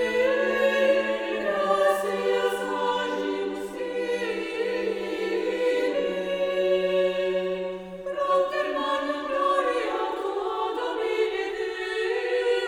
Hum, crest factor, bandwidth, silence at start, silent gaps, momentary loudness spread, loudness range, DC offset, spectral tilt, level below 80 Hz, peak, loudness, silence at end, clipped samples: none; 16 dB; 18 kHz; 0 s; none; 7 LU; 3 LU; under 0.1%; -4 dB/octave; -60 dBFS; -10 dBFS; -26 LUFS; 0 s; under 0.1%